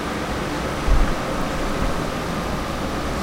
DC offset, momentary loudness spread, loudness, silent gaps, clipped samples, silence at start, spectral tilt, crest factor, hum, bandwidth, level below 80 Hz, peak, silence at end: under 0.1%; 3 LU; -24 LUFS; none; under 0.1%; 0 s; -5 dB/octave; 18 dB; none; 16 kHz; -26 dBFS; -4 dBFS; 0 s